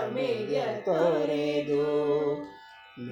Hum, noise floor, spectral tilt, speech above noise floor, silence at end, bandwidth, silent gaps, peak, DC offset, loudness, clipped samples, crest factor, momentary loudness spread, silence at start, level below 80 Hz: none; -49 dBFS; -6.5 dB/octave; 23 dB; 0 s; 9.6 kHz; none; -12 dBFS; under 0.1%; -28 LUFS; under 0.1%; 16 dB; 13 LU; 0 s; -68 dBFS